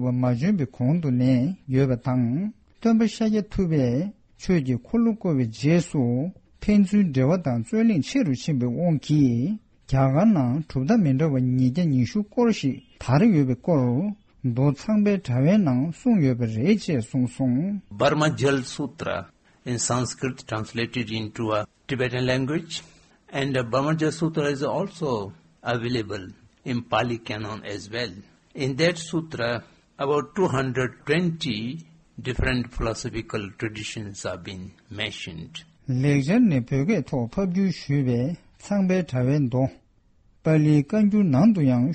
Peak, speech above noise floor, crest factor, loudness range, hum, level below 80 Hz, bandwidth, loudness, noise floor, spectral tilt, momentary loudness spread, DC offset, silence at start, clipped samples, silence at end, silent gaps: -8 dBFS; 37 dB; 16 dB; 6 LU; none; -46 dBFS; 8.8 kHz; -24 LUFS; -59 dBFS; -6.5 dB/octave; 12 LU; under 0.1%; 0 s; under 0.1%; 0 s; none